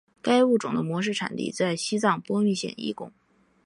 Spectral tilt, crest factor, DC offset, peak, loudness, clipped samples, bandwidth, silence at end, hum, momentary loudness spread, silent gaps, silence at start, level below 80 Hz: -5 dB/octave; 18 dB; under 0.1%; -8 dBFS; -25 LUFS; under 0.1%; 11 kHz; 0.55 s; none; 12 LU; none; 0.25 s; -70 dBFS